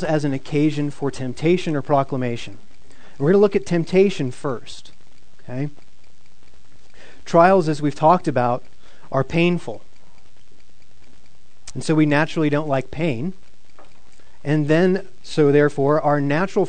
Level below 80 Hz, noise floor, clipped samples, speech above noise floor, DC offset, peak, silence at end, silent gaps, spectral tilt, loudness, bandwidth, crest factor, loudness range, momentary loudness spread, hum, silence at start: -52 dBFS; -56 dBFS; under 0.1%; 37 dB; 4%; 0 dBFS; 0 s; none; -7 dB/octave; -20 LUFS; 9.4 kHz; 20 dB; 6 LU; 15 LU; none; 0 s